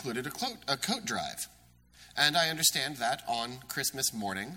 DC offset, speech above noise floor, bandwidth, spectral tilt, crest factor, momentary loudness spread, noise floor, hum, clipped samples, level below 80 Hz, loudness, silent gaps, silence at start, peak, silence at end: under 0.1%; 26 dB; 16.5 kHz; -1.5 dB/octave; 24 dB; 11 LU; -58 dBFS; 60 Hz at -65 dBFS; under 0.1%; -66 dBFS; -30 LUFS; none; 0 s; -8 dBFS; 0 s